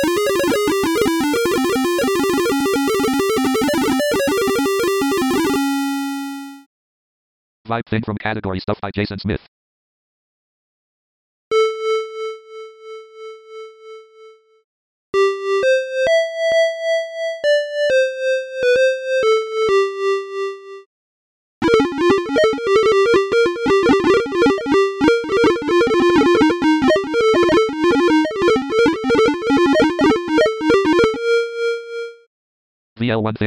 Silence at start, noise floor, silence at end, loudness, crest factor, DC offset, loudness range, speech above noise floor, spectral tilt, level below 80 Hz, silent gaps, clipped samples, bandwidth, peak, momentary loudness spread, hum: 0 s; -46 dBFS; 0 s; -17 LUFS; 16 dB; under 0.1%; 10 LU; 24 dB; -4.5 dB/octave; -48 dBFS; 6.66-7.65 s, 9.48-11.51 s, 14.64-15.13 s, 20.86-21.62 s, 32.27-32.96 s; under 0.1%; 18 kHz; 0 dBFS; 11 LU; none